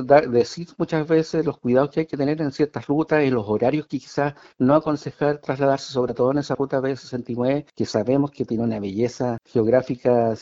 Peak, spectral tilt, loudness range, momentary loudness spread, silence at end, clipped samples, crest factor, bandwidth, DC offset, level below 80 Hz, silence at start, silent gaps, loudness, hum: -2 dBFS; -7 dB/octave; 2 LU; 6 LU; 0 s; under 0.1%; 20 dB; 7.8 kHz; under 0.1%; -56 dBFS; 0 s; none; -22 LUFS; none